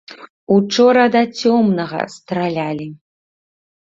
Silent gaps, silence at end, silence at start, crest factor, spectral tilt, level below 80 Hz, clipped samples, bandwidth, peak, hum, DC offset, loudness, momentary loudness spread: 0.30-0.47 s; 1.05 s; 0.1 s; 16 dB; -5.5 dB/octave; -60 dBFS; under 0.1%; 7.8 kHz; -2 dBFS; none; under 0.1%; -16 LUFS; 13 LU